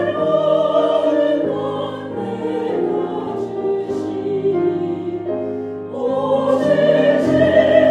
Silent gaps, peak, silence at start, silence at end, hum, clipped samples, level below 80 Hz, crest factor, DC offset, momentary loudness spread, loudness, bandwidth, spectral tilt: none; 0 dBFS; 0 s; 0 s; none; under 0.1%; -58 dBFS; 16 dB; under 0.1%; 11 LU; -18 LUFS; 9.4 kHz; -7 dB/octave